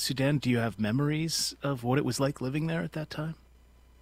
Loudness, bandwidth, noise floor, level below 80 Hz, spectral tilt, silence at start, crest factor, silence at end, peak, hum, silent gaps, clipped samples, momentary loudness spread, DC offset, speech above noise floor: -30 LUFS; 16 kHz; -57 dBFS; -56 dBFS; -5 dB/octave; 0 s; 16 dB; 0.65 s; -14 dBFS; none; none; under 0.1%; 9 LU; under 0.1%; 28 dB